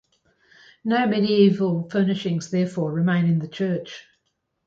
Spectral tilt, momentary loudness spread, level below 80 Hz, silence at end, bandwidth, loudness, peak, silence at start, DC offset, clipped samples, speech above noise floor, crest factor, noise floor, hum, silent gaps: -7 dB/octave; 11 LU; -66 dBFS; 0.65 s; 7.8 kHz; -22 LUFS; -6 dBFS; 0.85 s; under 0.1%; under 0.1%; 53 dB; 18 dB; -74 dBFS; none; none